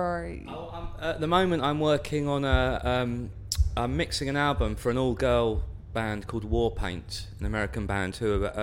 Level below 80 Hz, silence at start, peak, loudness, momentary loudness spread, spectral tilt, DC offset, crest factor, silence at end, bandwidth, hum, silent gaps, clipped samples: -36 dBFS; 0 s; -10 dBFS; -28 LUFS; 10 LU; -5.5 dB/octave; under 0.1%; 16 dB; 0 s; 16.5 kHz; none; none; under 0.1%